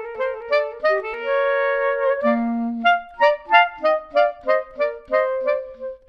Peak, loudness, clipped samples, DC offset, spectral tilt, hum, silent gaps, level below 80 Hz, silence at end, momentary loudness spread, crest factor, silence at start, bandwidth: 0 dBFS; -20 LUFS; under 0.1%; under 0.1%; -5 dB/octave; none; none; -56 dBFS; 0.1 s; 8 LU; 20 dB; 0 s; 6.2 kHz